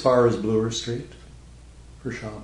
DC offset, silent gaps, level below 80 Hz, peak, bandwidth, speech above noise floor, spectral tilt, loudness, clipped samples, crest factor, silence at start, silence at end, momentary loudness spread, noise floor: under 0.1%; none; -48 dBFS; -6 dBFS; 11 kHz; 23 dB; -5.5 dB/octave; -24 LUFS; under 0.1%; 20 dB; 0 s; 0 s; 17 LU; -46 dBFS